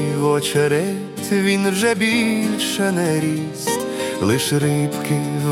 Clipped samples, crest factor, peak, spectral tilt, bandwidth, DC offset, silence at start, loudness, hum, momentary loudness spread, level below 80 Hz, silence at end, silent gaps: under 0.1%; 14 dB; -4 dBFS; -5 dB/octave; 17.5 kHz; under 0.1%; 0 s; -19 LUFS; none; 5 LU; -60 dBFS; 0 s; none